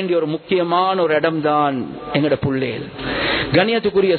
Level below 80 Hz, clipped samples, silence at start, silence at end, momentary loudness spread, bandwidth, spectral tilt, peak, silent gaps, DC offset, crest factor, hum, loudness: -46 dBFS; under 0.1%; 0 s; 0 s; 7 LU; 4.6 kHz; -11 dB/octave; 0 dBFS; none; under 0.1%; 16 dB; none; -18 LUFS